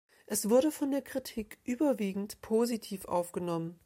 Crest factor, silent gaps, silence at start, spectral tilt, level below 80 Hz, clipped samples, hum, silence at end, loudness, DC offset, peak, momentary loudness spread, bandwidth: 18 dB; none; 0.3 s; -5 dB/octave; -66 dBFS; under 0.1%; none; 0.1 s; -32 LUFS; under 0.1%; -14 dBFS; 11 LU; 16.5 kHz